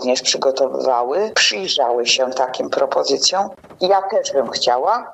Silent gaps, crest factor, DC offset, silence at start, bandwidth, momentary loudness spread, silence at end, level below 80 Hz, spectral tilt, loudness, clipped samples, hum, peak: none; 16 dB; under 0.1%; 0 s; 8.6 kHz; 5 LU; 0 s; -66 dBFS; -1 dB/octave; -17 LUFS; under 0.1%; none; -2 dBFS